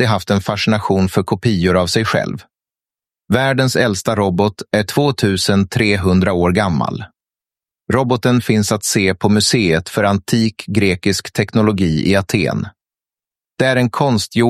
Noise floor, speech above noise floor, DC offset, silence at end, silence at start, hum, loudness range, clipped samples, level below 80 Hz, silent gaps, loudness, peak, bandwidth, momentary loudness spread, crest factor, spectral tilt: under -90 dBFS; over 75 dB; under 0.1%; 0 s; 0 s; none; 2 LU; under 0.1%; -44 dBFS; none; -15 LUFS; 0 dBFS; 14.5 kHz; 4 LU; 16 dB; -5 dB/octave